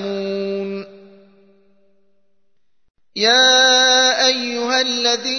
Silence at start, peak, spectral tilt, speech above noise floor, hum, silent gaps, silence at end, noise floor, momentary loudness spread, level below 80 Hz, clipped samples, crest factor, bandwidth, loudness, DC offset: 0 s; -2 dBFS; -0.5 dB/octave; 58 dB; none; none; 0 s; -74 dBFS; 16 LU; -74 dBFS; under 0.1%; 16 dB; 6.6 kHz; -14 LUFS; 0.2%